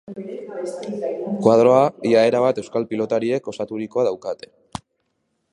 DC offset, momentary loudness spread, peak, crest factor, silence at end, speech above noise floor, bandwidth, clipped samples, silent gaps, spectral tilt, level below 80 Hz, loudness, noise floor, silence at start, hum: under 0.1%; 18 LU; -2 dBFS; 20 dB; 1.2 s; 52 dB; 11 kHz; under 0.1%; none; -6.5 dB/octave; -62 dBFS; -20 LUFS; -72 dBFS; 0.1 s; none